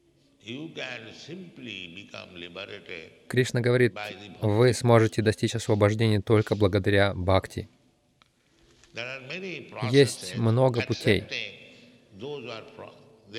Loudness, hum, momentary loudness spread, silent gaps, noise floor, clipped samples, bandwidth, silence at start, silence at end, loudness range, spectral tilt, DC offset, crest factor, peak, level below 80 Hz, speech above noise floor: -25 LUFS; none; 20 LU; none; -65 dBFS; under 0.1%; 13.5 kHz; 0.45 s; 0 s; 6 LU; -6 dB/octave; under 0.1%; 20 dB; -6 dBFS; -58 dBFS; 39 dB